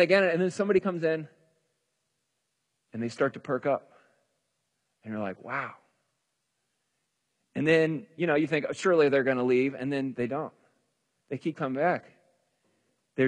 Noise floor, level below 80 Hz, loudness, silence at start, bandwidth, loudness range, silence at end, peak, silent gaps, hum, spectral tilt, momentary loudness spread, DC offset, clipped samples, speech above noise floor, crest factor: -80 dBFS; -74 dBFS; -28 LUFS; 0 s; 10 kHz; 11 LU; 0 s; -10 dBFS; none; none; -6.5 dB/octave; 14 LU; under 0.1%; under 0.1%; 53 dB; 20 dB